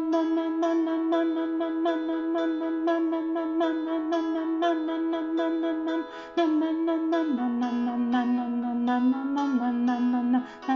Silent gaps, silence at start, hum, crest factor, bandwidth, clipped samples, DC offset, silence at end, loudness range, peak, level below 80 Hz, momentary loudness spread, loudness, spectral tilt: none; 0 s; none; 12 dB; 6.8 kHz; under 0.1%; under 0.1%; 0 s; 1 LU; -14 dBFS; -70 dBFS; 3 LU; -27 LUFS; -3 dB/octave